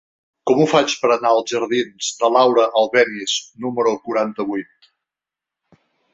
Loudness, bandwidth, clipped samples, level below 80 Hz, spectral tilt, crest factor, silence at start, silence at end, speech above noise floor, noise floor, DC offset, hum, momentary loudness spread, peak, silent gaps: -18 LUFS; 8.2 kHz; under 0.1%; -66 dBFS; -3.5 dB/octave; 18 dB; 0.45 s; 1.5 s; 70 dB; -87 dBFS; under 0.1%; none; 10 LU; -2 dBFS; none